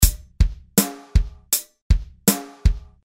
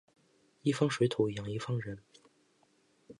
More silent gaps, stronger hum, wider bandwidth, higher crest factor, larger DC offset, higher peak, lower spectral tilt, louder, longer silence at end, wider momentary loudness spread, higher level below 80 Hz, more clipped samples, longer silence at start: first, 1.82-1.90 s vs none; neither; first, 16.5 kHz vs 11.5 kHz; about the same, 20 dB vs 20 dB; neither; first, 0 dBFS vs -16 dBFS; second, -4 dB/octave vs -6 dB/octave; first, -22 LUFS vs -33 LUFS; first, 0.2 s vs 0.05 s; second, 4 LU vs 11 LU; first, -22 dBFS vs -68 dBFS; neither; second, 0 s vs 0.65 s